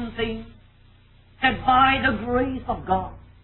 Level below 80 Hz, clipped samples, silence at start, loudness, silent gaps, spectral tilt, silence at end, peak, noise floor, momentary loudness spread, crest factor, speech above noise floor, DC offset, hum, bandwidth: -42 dBFS; under 0.1%; 0 s; -22 LUFS; none; -9 dB/octave; 0.2 s; -6 dBFS; -53 dBFS; 12 LU; 18 dB; 31 dB; under 0.1%; 60 Hz at -45 dBFS; 4.2 kHz